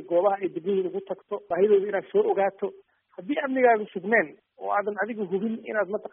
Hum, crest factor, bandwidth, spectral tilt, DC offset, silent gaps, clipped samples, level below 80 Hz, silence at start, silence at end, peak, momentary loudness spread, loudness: none; 18 dB; 3.7 kHz; -0.5 dB/octave; under 0.1%; none; under 0.1%; -76 dBFS; 0 s; 0.05 s; -8 dBFS; 13 LU; -26 LUFS